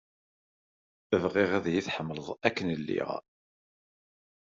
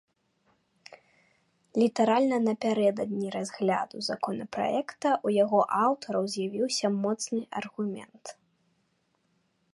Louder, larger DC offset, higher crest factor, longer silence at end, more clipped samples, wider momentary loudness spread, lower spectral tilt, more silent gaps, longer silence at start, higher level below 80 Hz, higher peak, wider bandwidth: about the same, -30 LUFS vs -28 LUFS; neither; first, 26 dB vs 18 dB; second, 1.25 s vs 1.45 s; neither; about the same, 9 LU vs 10 LU; about the same, -4.5 dB/octave vs -5 dB/octave; neither; second, 1.1 s vs 1.75 s; first, -68 dBFS vs -78 dBFS; first, -6 dBFS vs -12 dBFS; second, 7.6 kHz vs 11.5 kHz